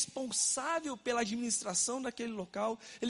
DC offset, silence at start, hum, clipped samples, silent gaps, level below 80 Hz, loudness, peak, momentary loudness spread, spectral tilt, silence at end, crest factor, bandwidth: under 0.1%; 0 s; none; under 0.1%; none; -74 dBFS; -34 LUFS; -18 dBFS; 8 LU; -2 dB/octave; 0 s; 18 dB; 11.5 kHz